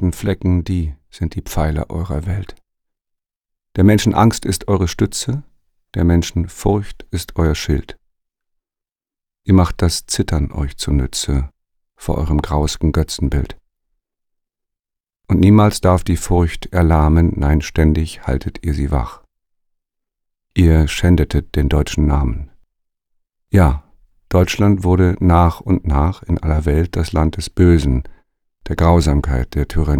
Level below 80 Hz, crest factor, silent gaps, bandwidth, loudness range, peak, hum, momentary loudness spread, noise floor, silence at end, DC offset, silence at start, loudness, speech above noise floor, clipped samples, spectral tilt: -24 dBFS; 16 dB; 3.36-3.40 s; 16 kHz; 6 LU; 0 dBFS; none; 11 LU; -88 dBFS; 0 s; under 0.1%; 0 s; -17 LUFS; 73 dB; under 0.1%; -6.5 dB/octave